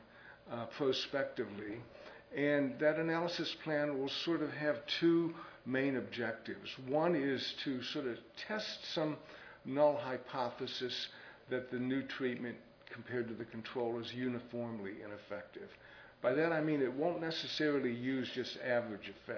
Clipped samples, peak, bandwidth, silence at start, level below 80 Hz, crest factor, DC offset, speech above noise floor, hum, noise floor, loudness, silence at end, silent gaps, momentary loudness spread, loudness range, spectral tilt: under 0.1%; -18 dBFS; 5.4 kHz; 0 s; -76 dBFS; 20 dB; under 0.1%; 20 dB; none; -57 dBFS; -37 LUFS; 0 s; none; 14 LU; 5 LU; -3.5 dB/octave